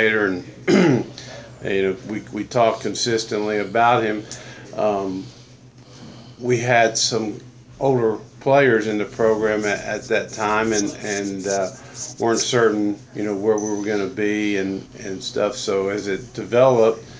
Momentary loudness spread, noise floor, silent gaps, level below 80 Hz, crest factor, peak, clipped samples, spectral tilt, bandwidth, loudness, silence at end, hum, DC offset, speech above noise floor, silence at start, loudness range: 14 LU; -45 dBFS; none; -54 dBFS; 18 dB; -2 dBFS; under 0.1%; -4.5 dB/octave; 8 kHz; -20 LUFS; 0 s; none; under 0.1%; 25 dB; 0 s; 3 LU